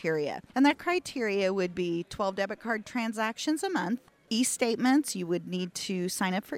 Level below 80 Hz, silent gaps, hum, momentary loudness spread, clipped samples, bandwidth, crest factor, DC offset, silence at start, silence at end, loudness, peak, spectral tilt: -66 dBFS; none; none; 8 LU; under 0.1%; 16 kHz; 18 dB; under 0.1%; 0 s; 0 s; -30 LUFS; -10 dBFS; -4 dB/octave